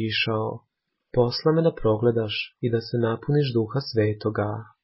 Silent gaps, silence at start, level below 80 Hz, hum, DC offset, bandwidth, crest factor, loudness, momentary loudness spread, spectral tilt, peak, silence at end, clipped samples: none; 0 s; -52 dBFS; none; under 0.1%; 5.8 kHz; 16 dB; -24 LUFS; 7 LU; -10.5 dB/octave; -8 dBFS; 0.2 s; under 0.1%